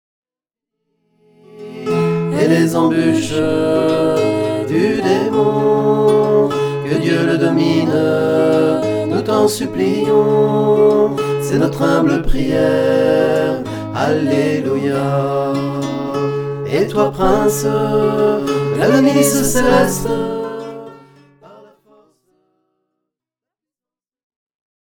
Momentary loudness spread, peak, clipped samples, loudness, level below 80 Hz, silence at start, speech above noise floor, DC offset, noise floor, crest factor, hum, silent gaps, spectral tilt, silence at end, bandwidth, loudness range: 7 LU; 0 dBFS; under 0.1%; -15 LUFS; -36 dBFS; 1.55 s; over 76 dB; under 0.1%; under -90 dBFS; 16 dB; none; none; -6 dB/octave; 4.05 s; 19 kHz; 4 LU